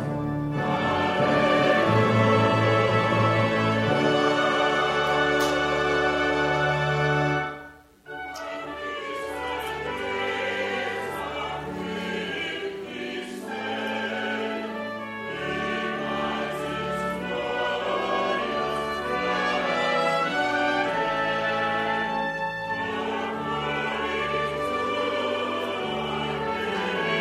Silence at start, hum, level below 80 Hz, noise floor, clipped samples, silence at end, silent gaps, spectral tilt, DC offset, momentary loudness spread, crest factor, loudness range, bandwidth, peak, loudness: 0 s; none; -52 dBFS; -46 dBFS; under 0.1%; 0 s; none; -5.5 dB/octave; under 0.1%; 11 LU; 18 dB; 9 LU; 15 kHz; -8 dBFS; -25 LUFS